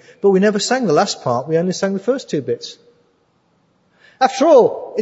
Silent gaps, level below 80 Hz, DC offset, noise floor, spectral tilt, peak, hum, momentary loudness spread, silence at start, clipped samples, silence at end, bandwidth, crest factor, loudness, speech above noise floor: none; -68 dBFS; under 0.1%; -60 dBFS; -5 dB/octave; 0 dBFS; none; 11 LU; 0.25 s; under 0.1%; 0 s; 8 kHz; 16 dB; -16 LUFS; 45 dB